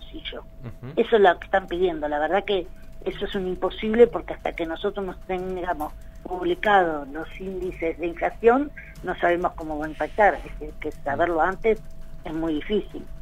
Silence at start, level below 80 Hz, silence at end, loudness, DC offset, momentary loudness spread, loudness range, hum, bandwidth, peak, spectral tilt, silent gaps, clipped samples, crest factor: 0 s; -40 dBFS; 0 s; -24 LUFS; under 0.1%; 16 LU; 2 LU; none; 14.5 kHz; -4 dBFS; -6.5 dB/octave; none; under 0.1%; 20 dB